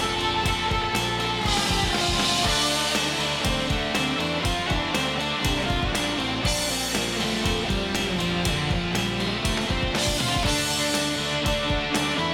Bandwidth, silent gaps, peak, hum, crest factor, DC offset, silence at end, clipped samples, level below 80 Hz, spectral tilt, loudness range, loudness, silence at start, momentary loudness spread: 17.5 kHz; none; -8 dBFS; none; 16 dB; under 0.1%; 0 s; under 0.1%; -36 dBFS; -3.5 dB/octave; 2 LU; -24 LUFS; 0 s; 3 LU